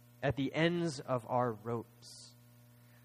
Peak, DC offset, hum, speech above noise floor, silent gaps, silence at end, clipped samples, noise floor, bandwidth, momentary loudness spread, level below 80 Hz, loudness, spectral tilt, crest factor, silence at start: -16 dBFS; under 0.1%; 60 Hz at -60 dBFS; 25 dB; none; 0.75 s; under 0.1%; -61 dBFS; 15.5 kHz; 20 LU; -66 dBFS; -35 LUFS; -6 dB/octave; 20 dB; 0.2 s